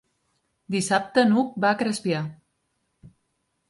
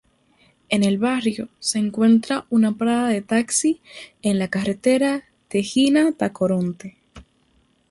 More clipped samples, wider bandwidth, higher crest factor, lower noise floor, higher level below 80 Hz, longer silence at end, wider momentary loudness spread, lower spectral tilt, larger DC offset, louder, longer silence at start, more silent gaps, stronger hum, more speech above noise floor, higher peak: neither; about the same, 11.5 kHz vs 11.5 kHz; about the same, 20 dB vs 16 dB; first, -74 dBFS vs -62 dBFS; second, -66 dBFS vs -58 dBFS; about the same, 0.6 s vs 0.7 s; about the same, 9 LU vs 9 LU; about the same, -5 dB/octave vs -4.5 dB/octave; neither; about the same, -23 LUFS vs -21 LUFS; about the same, 0.7 s vs 0.7 s; neither; neither; first, 52 dB vs 42 dB; about the same, -6 dBFS vs -6 dBFS